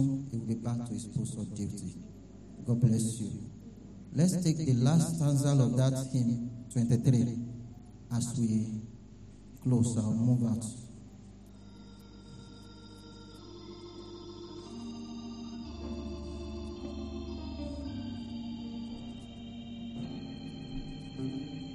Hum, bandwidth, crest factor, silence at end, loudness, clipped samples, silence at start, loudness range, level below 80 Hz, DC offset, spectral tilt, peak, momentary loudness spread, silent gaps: none; 13 kHz; 20 dB; 0 s; -33 LUFS; under 0.1%; 0 s; 17 LU; -52 dBFS; under 0.1%; -7 dB/octave; -14 dBFS; 23 LU; none